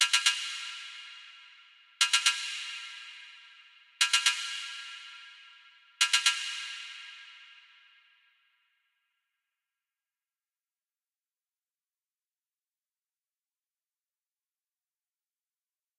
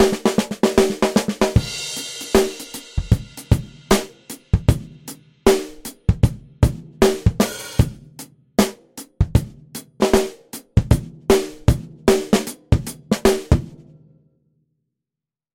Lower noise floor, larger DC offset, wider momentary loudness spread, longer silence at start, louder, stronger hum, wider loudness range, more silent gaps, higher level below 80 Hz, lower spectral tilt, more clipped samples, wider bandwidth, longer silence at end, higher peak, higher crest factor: about the same, under -90 dBFS vs -88 dBFS; neither; first, 24 LU vs 17 LU; about the same, 0 s vs 0 s; second, -28 LUFS vs -20 LUFS; neither; first, 5 LU vs 2 LU; neither; second, under -90 dBFS vs -30 dBFS; second, 8.5 dB/octave vs -5.5 dB/octave; neither; about the same, 15.5 kHz vs 17 kHz; first, 8.45 s vs 1.8 s; second, -10 dBFS vs -2 dBFS; first, 28 dB vs 18 dB